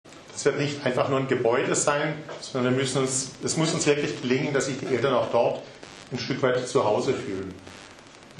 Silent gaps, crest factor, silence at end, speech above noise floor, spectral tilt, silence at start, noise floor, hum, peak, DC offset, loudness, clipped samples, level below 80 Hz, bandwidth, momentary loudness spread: none; 18 dB; 0 s; 23 dB; -4 dB/octave; 0.05 s; -48 dBFS; none; -8 dBFS; under 0.1%; -25 LUFS; under 0.1%; -62 dBFS; 11.5 kHz; 14 LU